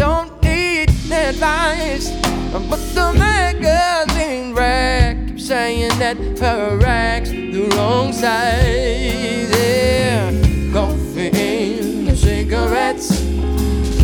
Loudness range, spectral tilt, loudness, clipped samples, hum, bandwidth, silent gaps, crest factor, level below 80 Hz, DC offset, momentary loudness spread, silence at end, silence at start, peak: 1 LU; -5 dB/octave; -17 LUFS; under 0.1%; none; over 20 kHz; none; 16 dB; -22 dBFS; under 0.1%; 5 LU; 0 s; 0 s; 0 dBFS